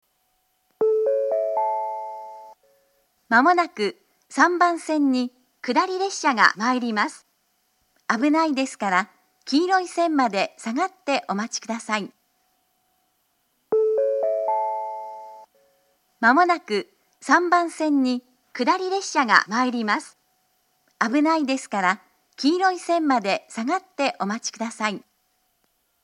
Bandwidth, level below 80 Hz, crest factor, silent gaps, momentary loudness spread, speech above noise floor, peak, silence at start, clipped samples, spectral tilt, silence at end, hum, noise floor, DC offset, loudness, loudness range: 11.5 kHz; -82 dBFS; 24 dB; none; 12 LU; 48 dB; 0 dBFS; 0.8 s; under 0.1%; -3.5 dB/octave; 1.05 s; none; -69 dBFS; under 0.1%; -22 LUFS; 5 LU